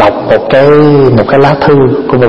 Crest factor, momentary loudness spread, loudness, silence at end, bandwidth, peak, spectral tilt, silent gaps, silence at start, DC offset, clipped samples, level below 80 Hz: 6 dB; 4 LU; -6 LUFS; 0 s; 6.6 kHz; 0 dBFS; -9 dB/octave; none; 0 s; under 0.1%; 3%; -34 dBFS